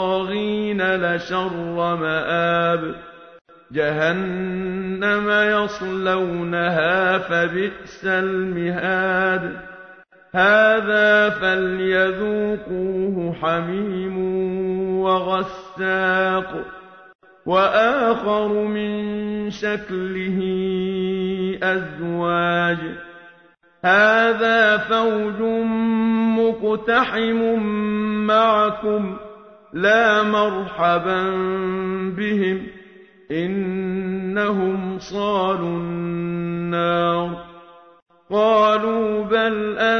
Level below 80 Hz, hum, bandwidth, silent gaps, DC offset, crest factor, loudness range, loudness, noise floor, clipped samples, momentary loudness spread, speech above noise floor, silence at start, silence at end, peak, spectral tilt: -54 dBFS; none; 6.6 kHz; 3.41-3.45 s, 17.15-17.19 s, 38.02-38.06 s; under 0.1%; 16 dB; 5 LU; -20 LUFS; -54 dBFS; under 0.1%; 10 LU; 34 dB; 0 s; 0 s; -4 dBFS; -6.5 dB/octave